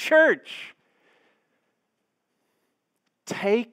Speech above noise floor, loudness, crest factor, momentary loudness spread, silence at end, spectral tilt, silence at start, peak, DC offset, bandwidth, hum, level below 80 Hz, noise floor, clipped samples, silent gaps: 56 dB; -22 LUFS; 20 dB; 25 LU; 0.1 s; -4 dB/octave; 0 s; -8 dBFS; under 0.1%; 15.5 kHz; none; -90 dBFS; -78 dBFS; under 0.1%; none